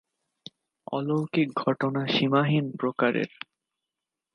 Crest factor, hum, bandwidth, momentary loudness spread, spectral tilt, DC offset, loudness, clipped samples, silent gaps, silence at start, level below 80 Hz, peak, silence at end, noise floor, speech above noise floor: 20 dB; none; 9.8 kHz; 23 LU; -7.5 dB/octave; under 0.1%; -26 LUFS; under 0.1%; none; 0.9 s; -74 dBFS; -8 dBFS; 1.1 s; -87 dBFS; 62 dB